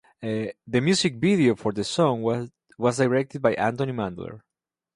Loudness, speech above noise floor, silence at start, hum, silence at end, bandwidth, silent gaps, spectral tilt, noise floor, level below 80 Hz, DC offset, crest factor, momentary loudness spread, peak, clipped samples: -24 LUFS; 65 dB; 0.2 s; none; 0.55 s; 11.5 kHz; none; -5.5 dB/octave; -88 dBFS; -58 dBFS; under 0.1%; 18 dB; 10 LU; -6 dBFS; under 0.1%